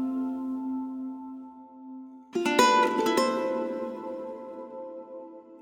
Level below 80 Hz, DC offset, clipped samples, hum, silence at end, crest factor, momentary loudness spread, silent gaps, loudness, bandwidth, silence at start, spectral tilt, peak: -76 dBFS; under 0.1%; under 0.1%; none; 0 s; 24 dB; 22 LU; none; -27 LUFS; 16.5 kHz; 0 s; -3 dB/octave; -6 dBFS